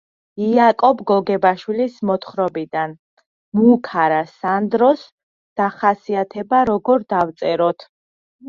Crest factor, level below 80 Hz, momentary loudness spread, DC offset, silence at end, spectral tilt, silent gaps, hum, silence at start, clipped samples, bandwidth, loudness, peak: 16 dB; -60 dBFS; 10 LU; under 0.1%; 0 s; -8 dB/octave; 2.99-3.17 s, 3.26-3.52 s, 5.12-5.56 s, 7.89-8.39 s; none; 0.35 s; under 0.1%; 7 kHz; -18 LUFS; -2 dBFS